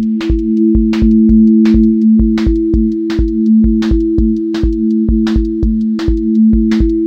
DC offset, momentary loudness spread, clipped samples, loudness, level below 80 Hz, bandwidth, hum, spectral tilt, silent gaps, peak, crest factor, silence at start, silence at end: under 0.1%; 6 LU; under 0.1%; -11 LUFS; -18 dBFS; 6.6 kHz; none; -9 dB/octave; none; 0 dBFS; 10 dB; 0 s; 0 s